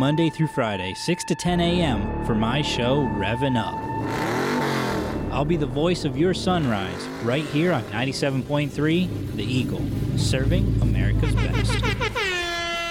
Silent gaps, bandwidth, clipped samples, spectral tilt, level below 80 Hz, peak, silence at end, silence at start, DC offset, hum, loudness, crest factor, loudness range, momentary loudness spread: none; 16 kHz; under 0.1%; -6 dB/octave; -34 dBFS; -10 dBFS; 0 s; 0 s; under 0.1%; none; -23 LUFS; 12 dB; 1 LU; 5 LU